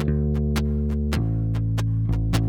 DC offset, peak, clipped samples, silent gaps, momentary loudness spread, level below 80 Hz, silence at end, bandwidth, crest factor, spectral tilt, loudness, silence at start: under 0.1%; -8 dBFS; under 0.1%; none; 1 LU; -28 dBFS; 0 s; 16 kHz; 14 dB; -7.5 dB/octave; -24 LUFS; 0 s